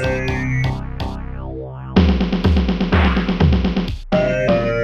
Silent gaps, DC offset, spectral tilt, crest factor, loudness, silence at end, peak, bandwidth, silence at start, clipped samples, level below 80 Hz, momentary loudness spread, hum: none; under 0.1%; -7.5 dB/octave; 14 dB; -18 LUFS; 0 s; -2 dBFS; 7.2 kHz; 0 s; under 0.1%; -24 dBFS; 12 LU; none